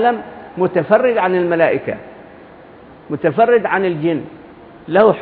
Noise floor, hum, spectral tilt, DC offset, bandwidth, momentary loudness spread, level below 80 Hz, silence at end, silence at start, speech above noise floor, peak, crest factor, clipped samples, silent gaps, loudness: -40 dBFS; none; -10.5 dB/octave; under 0.1%; 4.7 kHz; 14 LU; -56 dBFS; 0 s; 0 s; 25 dB; 0 dBFS; 16 dB; under 0.1%; none; -16 LUFS